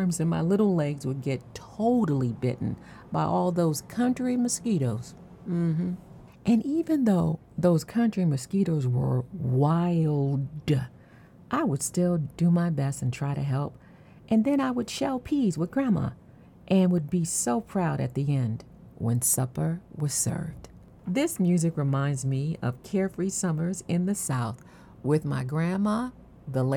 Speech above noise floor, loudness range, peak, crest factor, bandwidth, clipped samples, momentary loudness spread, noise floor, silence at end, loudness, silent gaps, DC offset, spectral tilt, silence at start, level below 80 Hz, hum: 26 dB; 3 LU; -12 dBFS; 16 dB; 18 kHz; under 0.1%; 9 LU; -52 dBFS; 0 s; -27 LUFS; none; under 0.1%; -6.5 dB/octave; 0 s; -56 dBFS; none